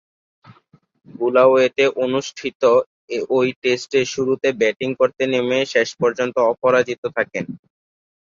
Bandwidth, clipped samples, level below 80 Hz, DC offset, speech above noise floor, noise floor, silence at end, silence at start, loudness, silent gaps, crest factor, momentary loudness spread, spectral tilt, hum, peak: 7.6 kHz; under 0.1%; -64 dBFS; under 0.1%; 36 dB; -54 dBFS; 0.75 s; 0.5 s; -19 LUFS; 2.55-2.60 s, 2.86-3.08 s, 3.56-3.62 s, 6.98-7.03 s; 16 dB; 9 LU; -4.5 dB/octave; none; -2 dBFS